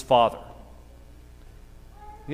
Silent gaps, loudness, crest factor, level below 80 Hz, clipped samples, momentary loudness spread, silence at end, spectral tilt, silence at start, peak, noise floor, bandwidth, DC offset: none; -22 LUFS; 22 dB; -48 dBFS; under 0.1%; 28 LU; 0 s; -5.5 dB/octave; 0 s; -6 dBFS; -47 dBFS; 15.5 kHz; under 0.1%